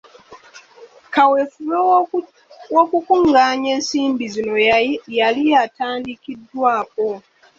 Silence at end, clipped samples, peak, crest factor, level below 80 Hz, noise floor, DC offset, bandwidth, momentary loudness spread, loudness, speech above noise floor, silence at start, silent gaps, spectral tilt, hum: 0.4 s; under 0.1%; -2 dBFS; 16 dB; -58 dBFS; -45 dBFS; under 0.1%; 7.8 kHz; 10 LU; -17 LUFS; 28 dB; 0.3 s; none; -3.5 dB/octave; none